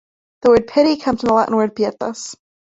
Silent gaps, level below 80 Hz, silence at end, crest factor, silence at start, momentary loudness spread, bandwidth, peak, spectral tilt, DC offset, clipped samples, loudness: none; -48 dBFS; 0.35 s; 16 dB; 0.45 s; 12 LU; 8.2 kHz; -2 dBFS; -5 dB/octave; under 0.1%; under 0.1%; -17 LUFS